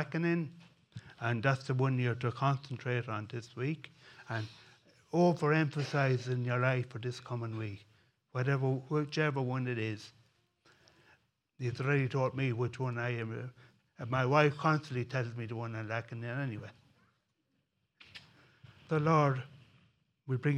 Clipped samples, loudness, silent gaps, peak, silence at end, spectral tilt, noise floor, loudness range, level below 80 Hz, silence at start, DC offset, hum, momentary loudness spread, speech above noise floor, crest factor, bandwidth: under 0.1%; -34 LUFS; none; -10 dBFS; 0 s; -7.5 dB/octave; -80 dBFS; 5 LU; -74 dBFS; 0 s; under 0.1%; none; 18 LU; 47 dB; 24 dB; 9 kHz